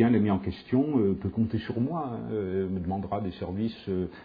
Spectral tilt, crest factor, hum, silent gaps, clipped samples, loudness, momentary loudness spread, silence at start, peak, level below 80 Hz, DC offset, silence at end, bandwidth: -11 dB/octave; 18 dB; none; none; under 0.1%; -29 LUFS; 8 LU; 0 s; -10 dBFS; -54 dBFS; under 0.1%; 0 s; 5 kHz